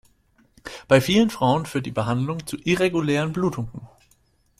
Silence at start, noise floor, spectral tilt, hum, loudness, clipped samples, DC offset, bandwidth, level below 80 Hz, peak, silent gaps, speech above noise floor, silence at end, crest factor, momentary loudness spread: 0.65 s; -62 dBFS; -6 dB/octave; none; -22 LUFS; under 0.1%; under 0.1%; 16 kHz; -52 dBFS; -2 dBFS; none; 41 dB; 0.75 s; 20 dB; 19 LU